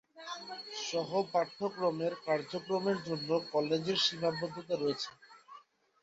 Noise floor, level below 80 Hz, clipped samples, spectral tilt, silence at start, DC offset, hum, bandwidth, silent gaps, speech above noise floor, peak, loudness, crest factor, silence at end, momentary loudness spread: -58 dBFS; -78 dBFS; under 0.1%; -4.5 dB/octave; 0.15 s; under 0.1%; none; 8 kHz; none; 25 dB; -18 dBFS; -34 LUFS; 18 dB; 0.45 s; 12 LU